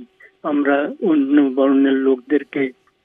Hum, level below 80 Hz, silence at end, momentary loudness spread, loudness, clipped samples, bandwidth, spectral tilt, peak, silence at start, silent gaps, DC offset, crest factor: none; -78 dBFS; 0.35 s; 9 LU; -17 LUFS; under 0.1%; 3.8 kHz; -8.5 dB/octave; -4 dBFS; 0 s; none; under 0.1%; 14 dB